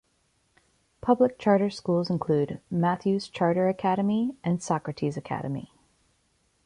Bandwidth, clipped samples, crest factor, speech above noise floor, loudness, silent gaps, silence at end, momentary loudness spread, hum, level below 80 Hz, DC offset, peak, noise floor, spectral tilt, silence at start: 11 kHz; under 0.1%; 18 dB; 44 dB; -26 LUFS; none; 1 s; 9 LU; none; -62 dBFS; under 0.1%; -8 dBFS; -70 dBFS; -7 dB/octave; 1.05 s